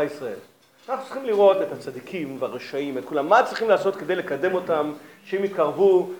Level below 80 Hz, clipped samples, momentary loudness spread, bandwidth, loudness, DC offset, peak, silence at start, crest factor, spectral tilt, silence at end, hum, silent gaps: -82 dBFS; under 0.1%; 14 LU; 19 kHz; -23 LUFS; under 0.1%; -4 dBFS; 0 s; 20 dB; -6 dB/octave; 0 s; none; none